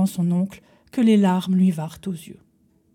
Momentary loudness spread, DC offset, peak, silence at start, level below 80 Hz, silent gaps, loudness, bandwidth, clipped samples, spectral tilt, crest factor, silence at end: 15 LU; under 0.1%; -8 dBFS; 0 s; -62 dBFS; none; -21 LUFS; 15.5 kHz; under 0.1%; -7.5 dB/octave; 14 dB; 0.6 s